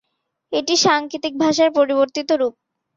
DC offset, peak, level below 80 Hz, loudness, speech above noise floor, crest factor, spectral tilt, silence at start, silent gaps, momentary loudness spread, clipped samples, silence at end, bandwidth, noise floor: under 0.1%; -2 dBFS; -64 dBFS; -18 LUFS; 54 dB; 16 dB; -2.5 dB/octave; 0.5 s; none; 9 LU; under 0.1%; 0.45 s; 7.8 kHz; -71 dBFS